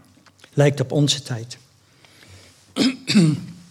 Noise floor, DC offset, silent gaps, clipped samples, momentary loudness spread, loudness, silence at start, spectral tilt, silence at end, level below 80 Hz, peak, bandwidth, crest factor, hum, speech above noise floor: -54 dBFS; under 0.1%; none; under 0.1%; 15 LU; -20 LUFS; 0.55 s; -5.5 dB/octave; 0.1 s; -68 dBFS; -2 dBFS; 13.5 kHz; 20 dB; none; 35 dB